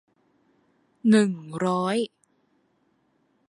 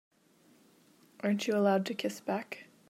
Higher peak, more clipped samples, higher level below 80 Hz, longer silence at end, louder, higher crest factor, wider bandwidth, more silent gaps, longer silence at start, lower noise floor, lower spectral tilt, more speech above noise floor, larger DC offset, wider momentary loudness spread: first, -8 dBFS vs -16 dBFS; neither; first, -72 dBFS vs -88 dBFS; first, 1.4 s vs 0.25 s; first, -24 LUFS vs -32 LUFS; about the same, 20 dB vs 18 dB; second, 11.5 kHz vs 15 kHz; neither; second, 1.05 s vs 1.25 s; about the same, -68 dBFS vs -65 dBFS; about the same, -6 dB/octave vs -5.5 dB/octave; first, 46 dB vs 34 dB; neither; about the same, 9 LU vs 9 LU